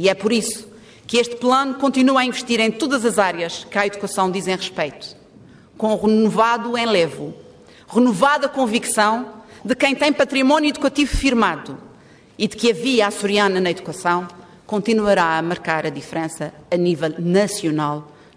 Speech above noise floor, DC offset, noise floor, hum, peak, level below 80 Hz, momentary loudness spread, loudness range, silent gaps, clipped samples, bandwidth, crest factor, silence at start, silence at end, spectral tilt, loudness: 28 dB; under 0.1%; -47 dBFS; none; -2 dBFS; -42 dBFS; 10 LU; 3 LU; none; under 0.1%; 11 kHz; 18 dB; 0 s; 0.3 s; -4.5 dB/octave; -19 LUFS